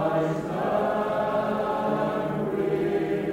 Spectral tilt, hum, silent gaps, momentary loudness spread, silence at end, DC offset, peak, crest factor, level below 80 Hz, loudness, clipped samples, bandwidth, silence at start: -7.5 dB/octave; none; none; 3 LU; 0 s; under 0.1%; -12 dBFS; 12 dB; -56 dBFS; -26 LUFS; under 0.1%; 16 kHz; 0 s